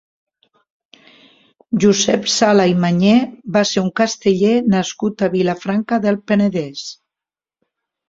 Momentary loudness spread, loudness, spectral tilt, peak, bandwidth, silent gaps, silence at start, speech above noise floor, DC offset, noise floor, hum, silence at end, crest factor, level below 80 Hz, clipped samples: 8 LU; -16 LUFS; -5 dB/octave; -2 dBFS; 7.8 kHz; none; 1.7 s; 73 dB; under 0.1%; -89 dBFS; none; 1.15 s; 16 dB; -56 dBFS; under 0.1%